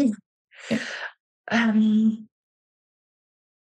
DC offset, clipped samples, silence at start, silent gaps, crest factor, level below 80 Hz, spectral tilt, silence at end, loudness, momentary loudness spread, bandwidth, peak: under 0.1%; under 0.1%; 0 s; 0.26-0.48 s, 1.20-1.44 s; 16 dB; -74 dBFS; -6 dB/octave; 1.4 s; -23 LUFS; 18 LU; 8.8 kHz; -10 dBFS